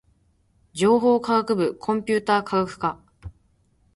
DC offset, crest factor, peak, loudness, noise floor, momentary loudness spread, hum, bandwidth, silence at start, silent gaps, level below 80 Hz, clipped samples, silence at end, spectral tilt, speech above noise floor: under 0.1%; 16 dB; -8 dBFS; -22 LUFS; -63 dBFS; 10 LU; none; 11.5 kHz; 0.75 s; none; -54 dBFS; under 0.1%; 0.65 s; -5.5 dB/octave; 42 dB